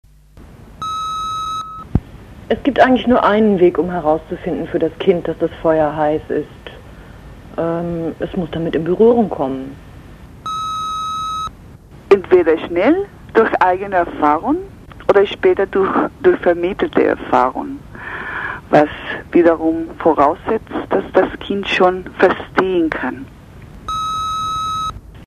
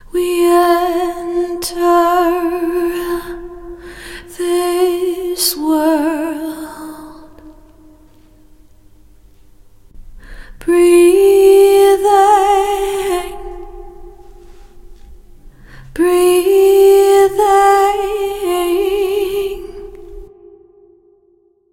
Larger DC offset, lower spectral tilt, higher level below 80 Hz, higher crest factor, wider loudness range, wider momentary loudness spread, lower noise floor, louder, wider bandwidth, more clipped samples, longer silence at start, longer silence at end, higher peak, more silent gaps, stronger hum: neither; first, -6.5 dB/octave vs -3.5 dB/octave; about the same, -40 dBFS vs -40 dBFS; about the same, 16 dB vs 14 dB; second, 4 LU vs 11 LU; second, 12 LU vs 22 LU; second, -42 dBFS vs -54 dBFS; second, -17 LUFS vs -13 LUFS; second, 12 kHz vs 16.5 kHz; neither; first, 0.35 s vs 0.15 s; second, 0 s vs 1.45 s; about the same, 0 dBFS vs 0 dBFS; neither; neither